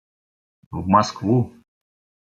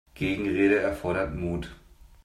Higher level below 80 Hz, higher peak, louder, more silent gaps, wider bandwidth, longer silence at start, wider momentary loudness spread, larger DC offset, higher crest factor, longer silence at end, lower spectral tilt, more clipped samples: second, -58 dBFS vs -46 dBFS; first, -2 dBFS vs -10 dBFS; first, -21 LUFS vs -27 LUFS; neither; second, 7.8 kHz vs 13.5 kHz; first, 0.7 s vs 0.15 s; about the same, 13 LU vs 11 LU; neither; about the same, 22 dB vs 18 dB; first, 0.85 s vs 0.5 s; about the same, -6.5 dB/octave vs -7 dB/octave; neither